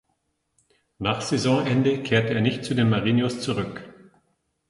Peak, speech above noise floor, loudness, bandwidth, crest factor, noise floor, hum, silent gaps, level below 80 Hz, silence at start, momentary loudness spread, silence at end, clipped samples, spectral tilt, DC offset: -6 dBFS; 51 dB; -23 LUFS; 11.5 kHz; 18 dB; -73 dBFS; none; none; -56 dBFS; 1 s; 8 LU; 0.8 s; under 0.1%; -6 dB/octave; under 0.1%